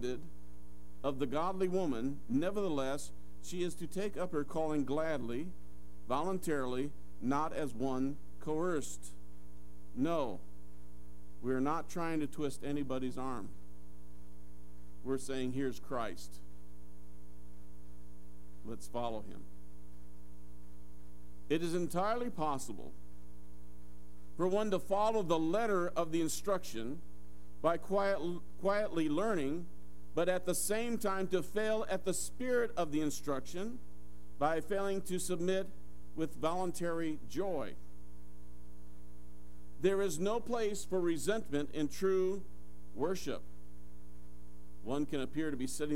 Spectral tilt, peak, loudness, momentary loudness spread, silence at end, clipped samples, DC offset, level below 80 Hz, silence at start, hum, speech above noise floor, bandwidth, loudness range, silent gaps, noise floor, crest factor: -5 dB/octave; -18 dBFS; -37 LUFS; 24 LU; 0 s; under 0.1%; 1%; -58 dBFS; 0 s; none; 20 dB; 16 kHz; 7 LU; none; -56 dBFS; 22 dB